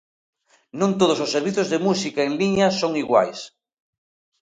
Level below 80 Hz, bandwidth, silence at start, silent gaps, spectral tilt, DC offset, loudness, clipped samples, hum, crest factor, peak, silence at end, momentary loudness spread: -60 dBFS; 9.4 kHz; 0.75 s; none; -5 dB/octave; under 0.1%; -21 LUFS; under 0.1%; none; 20 dB; -2 dBFS; 0.95 s; 8 LU